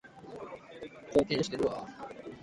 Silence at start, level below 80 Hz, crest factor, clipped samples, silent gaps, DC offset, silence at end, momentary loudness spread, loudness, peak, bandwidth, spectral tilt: 0.05 s; -60 dBFS; 22 dB; under 0.1%; none; under 0.1%; 0 s; 18 LU; -32 LUFS; -12 dBFS; 11.5 kHz; -5.5 dB/octave